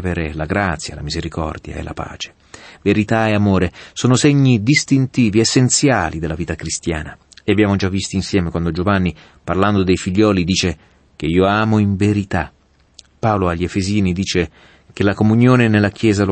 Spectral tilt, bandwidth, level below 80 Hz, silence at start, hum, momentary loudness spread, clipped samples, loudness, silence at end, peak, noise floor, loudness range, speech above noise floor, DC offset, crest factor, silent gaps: -5.5 dB/octave; 8.8 kHz; -38 dBFS; 0 s; none; 13 LU; under 0.1%; -17 LUFS; 0 s; -2 dBFS; -48 dBFS; 5 LU; 32 dB; under 0.1%; 14 dB; none